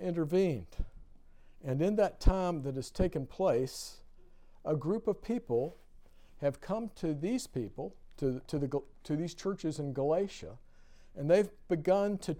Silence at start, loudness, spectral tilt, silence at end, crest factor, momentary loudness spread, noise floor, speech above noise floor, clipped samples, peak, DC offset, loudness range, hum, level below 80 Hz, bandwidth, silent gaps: 0 s; -34 LUFS; -7 dB/octave; 0 s; 22 dB; 14 LU; -55 dBFS; 22 dB; under 0.1%; -12 dBFS; under 0.1%; 3 LU; none; -44 dBFS; 16.5 kHz; none